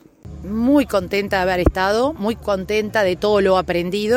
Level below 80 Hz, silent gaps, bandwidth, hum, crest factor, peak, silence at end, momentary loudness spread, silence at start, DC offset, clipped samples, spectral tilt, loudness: -34 dBFS; none; 16.5 kHz; none; 16 dB; -2 dBFS; 0 s; 6 LU; 0.25 s; under 0.1%; under 0.1%; -6 dB/octave; -19 LUFS